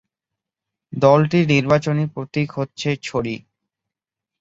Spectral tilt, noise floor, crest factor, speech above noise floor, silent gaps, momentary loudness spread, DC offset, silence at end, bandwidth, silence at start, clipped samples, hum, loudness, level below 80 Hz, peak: -7 dB/octave; -86 dBFS; 18 dB; 68 dB; none; 11 LU; under 0.1%; 1.05 s; 7.8 kHz; 0.9 s; under 0.1%; none; -19 LUFS; -54 dBFS; -2 dBFS